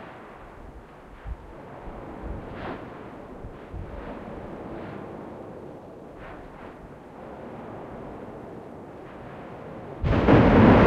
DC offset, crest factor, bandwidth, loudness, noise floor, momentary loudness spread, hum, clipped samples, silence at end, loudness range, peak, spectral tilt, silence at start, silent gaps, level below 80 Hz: under 0.1%; 22 dB; 7.6 kHz; -25 LUFS; -45 dBFS; 20 LU; none; under 0.1%; 0 s; 14 LU; -4 dBFS; -9 dB/octave; 0 s; none; -38 dBFS